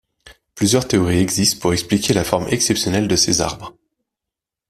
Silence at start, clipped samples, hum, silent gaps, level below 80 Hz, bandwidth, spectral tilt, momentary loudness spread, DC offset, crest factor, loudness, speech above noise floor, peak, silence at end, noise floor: 0.25 s; under 0.1%; none; none; -44 dBFS; 16 kHz; -4 dB/octave; 5 LU; under 0.1%; 18 dB; -17 LUFS; 68 dB; 0 dBFS; 1 s; -85 dBFS